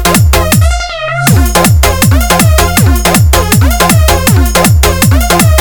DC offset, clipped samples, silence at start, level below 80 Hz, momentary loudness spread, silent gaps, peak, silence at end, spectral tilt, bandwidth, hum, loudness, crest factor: 1%; 0.7%; 0 s; -12 dBFS; 2 LU; none; 0 dBFS; 0 s; -4.5 dB/octave; over 20 kHz; none; -7 LUFS; 6 dB